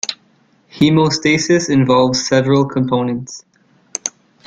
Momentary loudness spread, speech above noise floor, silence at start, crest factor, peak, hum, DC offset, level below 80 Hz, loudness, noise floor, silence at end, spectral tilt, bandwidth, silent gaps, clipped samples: 13 LU; 41 dB; 0.05 s; 16 dB; 0 dBFS; none; under 0.1%; -52 dBFS; -15 LUFS; -55 dBFS; 0.4 s; -5 dB/octave; 9.6 kHz; none; under 0.1%